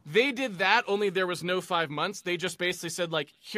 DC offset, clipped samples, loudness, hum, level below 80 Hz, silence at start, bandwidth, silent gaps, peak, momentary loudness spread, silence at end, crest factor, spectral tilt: under 0.1%; under 0.1%; -28 LUFS; none; -76 dBFS; 0.05 s; 15.5 kHz; none; -8 dBFS; 7 LU; 0 s; 20 dB; -3.5 dB/octave